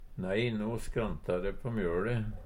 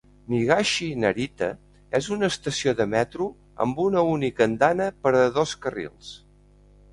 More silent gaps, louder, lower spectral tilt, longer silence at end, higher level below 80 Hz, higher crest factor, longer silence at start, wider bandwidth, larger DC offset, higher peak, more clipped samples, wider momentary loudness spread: neither; second, -34 LUFS vs -24 LUFS; first, -7 dB/octave vs -5 dB/octave; second, 0 s vs 0.75 s; first, -44 dBFS vs -54 dBFS; second, 14 dB vs 20 dB; second, 0 s vs 0.3 s; first, 16 kHz vs 11.5 kHz; neither; second, -18 dBFS vs -4 dBFS; neither; second, 4 LU vs 11 LU